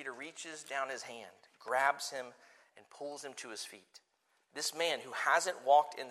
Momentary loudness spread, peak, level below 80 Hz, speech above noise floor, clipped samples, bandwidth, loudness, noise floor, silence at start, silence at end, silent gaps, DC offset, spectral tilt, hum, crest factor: 19 LU; -14 dBFS; under -90 dBFS; 40 dB; under 0.1%; 14.5 kHz; -35 LUFS; -76 dBFS; 0 s; 0 s; none; under 0.1%; -0.5 dB/octave; none; 22 dB